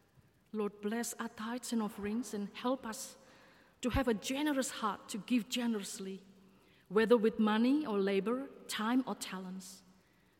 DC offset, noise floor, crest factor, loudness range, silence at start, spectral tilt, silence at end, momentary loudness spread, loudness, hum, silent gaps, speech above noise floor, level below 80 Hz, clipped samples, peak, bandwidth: under 0.1%; -68 dBFS; 20 dB; 6 LU; 0.55 s; -4.5 dB/octave; 0.6 s; 14 LU; -35 LUFS; none; none; 33 dB; -58 dBFS; under 0.1%; -16 dBFS; 16.5 kHz